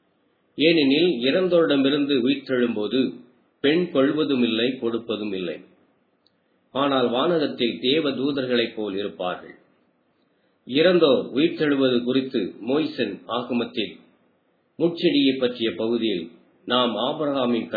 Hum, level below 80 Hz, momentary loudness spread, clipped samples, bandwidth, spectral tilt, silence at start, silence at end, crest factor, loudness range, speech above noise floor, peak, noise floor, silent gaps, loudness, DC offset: none; -72 dBFS; 10 LU; under 0.1%; 4.9 kHz; -8 dB/octave; 0.6 s; 0 s; 18 dB; 4 LU; 44 dB; -4 dBFS; -66 dBFS; none; -22 LUFS; under 0.1%